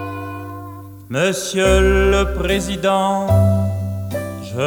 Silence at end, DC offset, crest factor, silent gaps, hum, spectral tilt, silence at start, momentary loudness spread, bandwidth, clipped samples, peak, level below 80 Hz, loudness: 0 s; under 0.1%; 16 dB; none; none; -5.5 dB/octave; 0 s; 16 LU; 20 kHz; under 0.1%; -2 dBFS; -26 dBFS; -17 LUFS